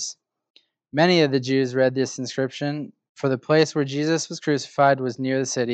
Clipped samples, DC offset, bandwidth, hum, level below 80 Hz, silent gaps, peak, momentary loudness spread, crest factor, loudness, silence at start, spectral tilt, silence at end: under 0.1%; under 0.1%; 9 kHz; none; -76 dBFS; 0.50-0.54 s, 3.09-3.15 s; -4 dBFS; 9 LU; 18 dB; -22 LUFS; 0 s; -5 dB/octave; 0 s